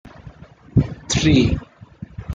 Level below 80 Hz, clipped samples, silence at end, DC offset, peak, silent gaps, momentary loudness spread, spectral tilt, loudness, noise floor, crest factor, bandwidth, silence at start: -34 dBFS; under 0.1%; 0 s; under 0.1%; -2 dBFS; none; 21 LU; -5.5 dB/octave; -19 LUFS; -42 dBFS; 18 dB; 9.4 kHz; 0.05 s